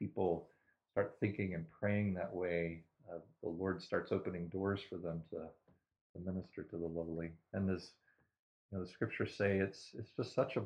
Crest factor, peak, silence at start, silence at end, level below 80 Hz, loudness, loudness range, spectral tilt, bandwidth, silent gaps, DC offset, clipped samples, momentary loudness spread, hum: 20 dB; -20 dBFS; 0 s; 0 s; -70 dBFS; -41 LUFS; 5 LU; -7.5 dB/octave; 9.6 kHz; 6.01-6.14 s, 8.39-8.69 s; under 0.1%; under 0.1%; 12 LU; none